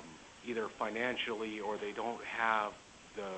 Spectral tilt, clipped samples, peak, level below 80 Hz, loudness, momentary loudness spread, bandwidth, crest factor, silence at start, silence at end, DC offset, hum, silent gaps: -3.5 dB/octave; under 0.1%; -16 dBFS; -70 dBFS; -37 LUFS; 16 LU; 8.4 kHz; 22 dB; 0 s; 0 s; under 0.1%; none; none